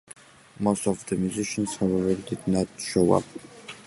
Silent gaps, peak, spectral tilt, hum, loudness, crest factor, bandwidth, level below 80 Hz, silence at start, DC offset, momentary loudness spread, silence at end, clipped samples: none; -6 dBFS; -5.5 dB/octave; none; -26 LUFS; 20 dB; 11.5 kHz; -52 dBFS; 0.6 s; under 0.1%; 6 LU; 0.05 s; under 0.1%